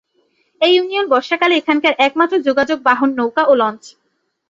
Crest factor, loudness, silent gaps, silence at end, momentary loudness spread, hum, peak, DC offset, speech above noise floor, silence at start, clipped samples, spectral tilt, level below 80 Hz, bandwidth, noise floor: 14 dB; -15 LUFS; none; 0.6 s; 3 LU; none; 0 dBFS; under 0.1%; 47 dB; 0.6 s; under 0.1%; -3.5 dB/octave; -62 dBFS; 7.6 kHz; -62 dBFS